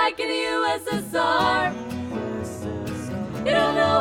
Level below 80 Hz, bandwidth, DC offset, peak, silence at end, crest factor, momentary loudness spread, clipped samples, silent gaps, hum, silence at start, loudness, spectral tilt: -50 dBFS; 18.5 kHz; under 0.1%; -8 dBFS; 0 s; 16 dB; 11 LU; under 0.1%; none; none; 0 s; -24 LUFS; -4.5 dB/octave